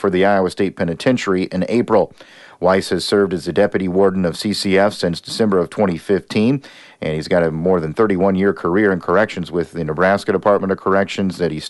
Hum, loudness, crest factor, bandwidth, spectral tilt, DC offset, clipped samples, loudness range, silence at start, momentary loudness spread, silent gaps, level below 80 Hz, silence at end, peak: none; -17 LUFS; 14 dB; 11.5 kHz; -6 dB/octave; under 0.1%; under 0.1%; 1 LU; 0 s; 5 LU; none; -48 dBFS; 0 s; -2 dBFS